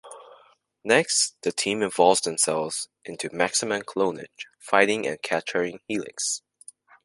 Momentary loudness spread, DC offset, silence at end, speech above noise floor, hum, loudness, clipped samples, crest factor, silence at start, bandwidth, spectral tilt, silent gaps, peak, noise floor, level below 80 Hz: 14 LU; under 0.1%; 0.65 s; 32 dB; none; -24 LUFS; under 0.1%; 24 dB; 0.05 s; 11.5 kHz; -2 dB/octave; none; -2 dBFS; -57 dBFS; -70 dBFS